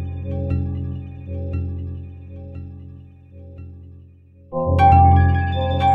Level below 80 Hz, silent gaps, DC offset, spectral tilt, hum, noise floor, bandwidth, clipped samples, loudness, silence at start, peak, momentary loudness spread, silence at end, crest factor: -32 dBFS; none; under 0.1%; -9 dB/octave; none; -47 dBFS; 4.1 kHz; under 0.1%; -19 LUFS; 0 s; -2 dBFS; 26 LU; 0 s; 18 dB